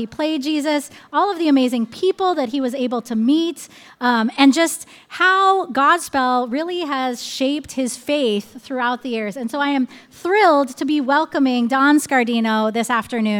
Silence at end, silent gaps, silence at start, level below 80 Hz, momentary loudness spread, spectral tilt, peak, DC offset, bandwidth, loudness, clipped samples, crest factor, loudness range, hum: 0 s; none; 0 s; -64 dBFS; 9 LU; -3.5 dB/octave; -2 dBFS; under 0.1%; 17 kHz; -18 LUFS; under 0.1%; 18 dB; 5 LU; none